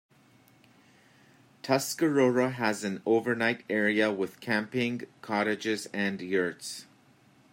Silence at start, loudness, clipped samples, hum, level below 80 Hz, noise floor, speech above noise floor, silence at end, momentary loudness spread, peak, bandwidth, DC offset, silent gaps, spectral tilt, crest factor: 1.65 s; -29 LUFS; under 0.1%; none; -76 dBFS; -61 dBFS; 32 dB; 0.7 s; 9 LU; -12 dBFS; 16 kHz; under 0.1%; none; -4.5 dB/octave; 18 dB